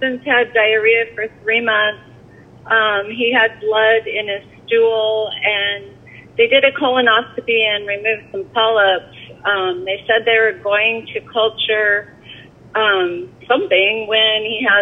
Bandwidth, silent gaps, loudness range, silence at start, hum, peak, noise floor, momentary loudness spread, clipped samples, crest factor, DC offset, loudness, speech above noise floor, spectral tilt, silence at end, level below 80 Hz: 3.9 kHz; none; 2 LU; 0 s; none; 0 dBFS; -42 dBFS; 10 LU; under 0.1%; 16 dB; under 0.1%; -15 LUFS; 26 dB; -5.5 dB/octave; 0 s; -58 dBFS